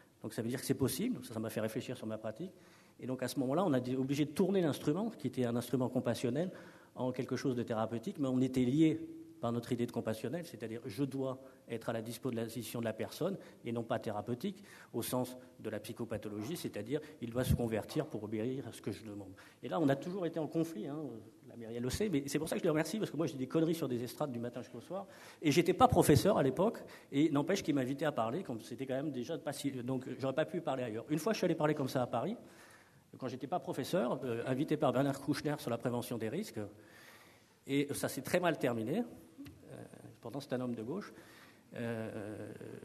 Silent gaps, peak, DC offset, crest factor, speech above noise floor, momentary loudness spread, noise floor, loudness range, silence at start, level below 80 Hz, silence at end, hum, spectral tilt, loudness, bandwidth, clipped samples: none; -12 dBFS; under 0.1%; 26 dB; 27 dB; 14 LU; -63 dBFS; 8 LU; 0.25 s; -62 dBFS; 0 s; none; -6 dB/octave; -37 LUFS; 13.5 kHz; under 0.1%